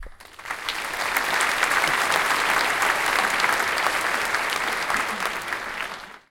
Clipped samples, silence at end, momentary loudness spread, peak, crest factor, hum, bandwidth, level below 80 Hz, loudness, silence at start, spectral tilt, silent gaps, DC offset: under 0.1%; 0.15 s; 10 LU; -4 dBFS; 20 dB; none; 17 kHz; -52 dBFS; -22 LUFS; 0 s; -0.5 dB/octave; none; under 0.1%